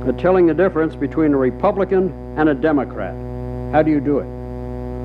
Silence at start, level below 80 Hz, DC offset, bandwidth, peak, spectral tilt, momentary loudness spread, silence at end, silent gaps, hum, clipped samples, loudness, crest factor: 0 s; -34 dBFS; under 0.1%; 5.2 kHz; -2 dBFS; -10 dB/octave; 13 LU; 0 s; none; none; under 0.1%; -18 LUFS; 16 dB